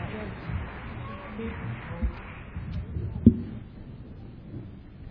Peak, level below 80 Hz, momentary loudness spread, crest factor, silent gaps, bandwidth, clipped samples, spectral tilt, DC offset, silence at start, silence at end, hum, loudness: -2 dBFS; -40 dBFS; 22 LU; 28 dB; none; 5.2 kHz; under 0.1%; -11.5 dB/octave; under 0.1%; 0 s; 0 s; none; -31 LUFS